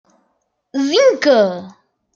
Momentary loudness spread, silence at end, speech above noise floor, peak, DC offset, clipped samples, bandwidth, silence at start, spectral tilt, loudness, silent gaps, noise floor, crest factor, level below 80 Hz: 14 LU; 0.45 s; 53 dB; -2 dBFS; under 0.1%; under 0.1%; 7.4 kHz; 0.75 s; -4 dB/octave; -14 LUFS; none; -67 dBFS; 16 dB; -70 dBFS